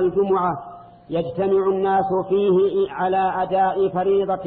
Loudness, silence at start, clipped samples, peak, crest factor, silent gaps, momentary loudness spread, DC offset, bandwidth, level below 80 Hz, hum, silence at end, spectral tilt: -20 LUFS; 0 s; under 0.1%; -10 dBFS; 10 dB; none; 7 LU; under 0.1%; 4.1 kHz; -54 dBFS; none; 0 s; -10.5 dB/octave